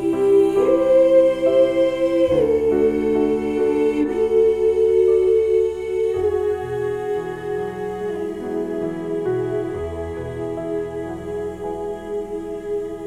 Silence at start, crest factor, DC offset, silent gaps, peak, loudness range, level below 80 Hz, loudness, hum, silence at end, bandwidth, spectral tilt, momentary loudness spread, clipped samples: 0 s; 14 dB; under 0.1%; none; -6 dBFS; 9 LU; -46 dBFS; -20 LUFS; none; 0 s; 11.5 kHz; -7 dB/octave; 12 LU; under 0.1%